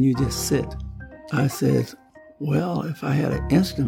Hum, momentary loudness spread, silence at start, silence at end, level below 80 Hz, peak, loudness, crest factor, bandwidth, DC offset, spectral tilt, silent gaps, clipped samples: none; 12 LU; 0 s; 0 s; -40 dBFS; -6 dBFS; -24 LUFS; 16 dB; 17 kHz; under 0.1%; -6 dB/octave; none; under 0.1%